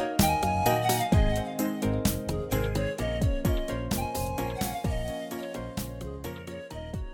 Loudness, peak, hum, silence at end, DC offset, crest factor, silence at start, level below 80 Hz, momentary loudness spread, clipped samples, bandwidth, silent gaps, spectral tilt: -29 LUFS; -10 dBFS; none; 0 s; under 0.1%; 20 dB; 0 s; -36 dBFS; 13 LU; under 0.1%; 17.5 kHz; none; -5.5 dB/octave